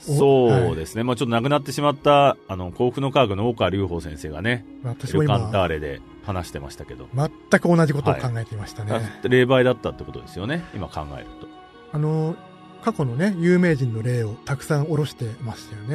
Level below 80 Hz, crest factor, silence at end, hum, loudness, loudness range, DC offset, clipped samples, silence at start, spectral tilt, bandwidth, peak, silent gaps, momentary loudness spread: -46 dBFS; 20 dB; 0 s; none; -22 LUFS; 5 LU; under 0.1%; under 0.1%; 0 s; -6.5 dB/octave; 13.5 kHz; -2 dBFS; none; 16 LU